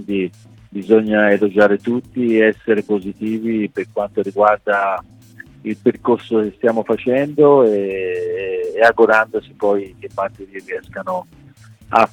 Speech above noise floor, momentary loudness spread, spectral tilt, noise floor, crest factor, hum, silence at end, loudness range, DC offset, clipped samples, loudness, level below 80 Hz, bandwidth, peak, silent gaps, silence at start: 27 dB; 14 LU; -7 dB/octave; -43 dBFS; 16 dB; none; 0.05 s; 4 LU; under 0.1%; under 0.1%; -17 LUFS; -56 dBFS; 9.8 kHz; 0 dBFS; none; 0 s